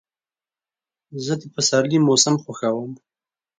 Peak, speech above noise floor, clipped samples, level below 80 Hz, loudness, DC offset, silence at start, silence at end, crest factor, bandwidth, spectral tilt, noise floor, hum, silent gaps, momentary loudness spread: 0 dBFS; over 70 dB; under 0.1%; -66 dBFS; -19 LUFS; under 0.1%; 1.1 s; 0.65 s; 22 dB; 9.6 kHz; -4 dB/octave; under -90 dBFS; none; none; 15 LU